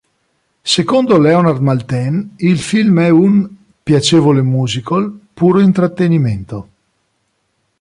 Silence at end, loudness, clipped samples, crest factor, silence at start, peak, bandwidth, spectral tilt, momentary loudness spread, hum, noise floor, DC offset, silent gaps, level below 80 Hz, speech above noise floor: 1.2 s; -13 LUFS; under 0.1%; 12 dB; 0.65 s; 0 dBFS; 11 kHz; -6.5 dB/octave; 13 LU; none; -65 dBFS; under 0.1%; none; -48 dBFS; 53 dB